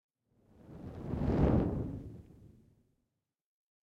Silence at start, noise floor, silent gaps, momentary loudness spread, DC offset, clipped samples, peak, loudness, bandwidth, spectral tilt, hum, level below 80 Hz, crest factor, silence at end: 0.7 s; -85 dBFS; none; 23 LU; under 0.1%; under 0.1%; -16 dBFS; -33 LUFS; 7 kHz; -10.5 dB/octave; none; -46 dBFS; 22 dB; 1.4 s